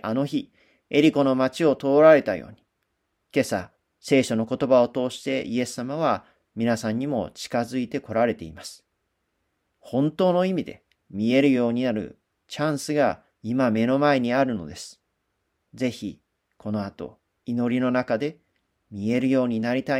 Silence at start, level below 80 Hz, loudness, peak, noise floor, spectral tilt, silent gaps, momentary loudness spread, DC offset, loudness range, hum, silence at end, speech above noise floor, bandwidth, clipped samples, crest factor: 0.05 s; -62 dBFS; -23 LUFS; -4 dBFS; -76 dBFS; -6 dB/octave; none; 18 LU; under 0.1%; 7 LU; none; 0 s; 53 dB; 14.5 kHz; under 0.1%; 20 dB